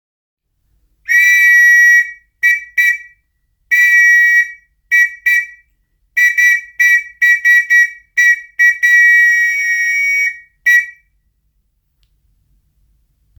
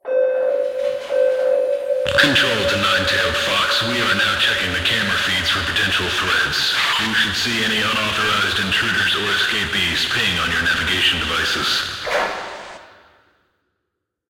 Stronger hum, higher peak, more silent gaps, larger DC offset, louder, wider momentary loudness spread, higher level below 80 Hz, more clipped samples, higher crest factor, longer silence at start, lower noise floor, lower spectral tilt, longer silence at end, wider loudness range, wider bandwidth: neither; about the same, -2 dBFS vs 0 dBFS; neither; neither; first, -9 LUFS vs -17 LUFS; first, 9 LU vs 5 LU; second, -60 dBFS vs -44 dBFS; neither; second, 12 dB vs 18 dB; first, 1.1 s vs 0.05 s; second, -63 dBFS vs -77 dBFS; second, 5 dB/octave vs -2.5 dB/octave; first, 2.5 s vs 1.45 s; about the same, 5 LU vs 3 LU; first, over 20 kHz vs 17 kHz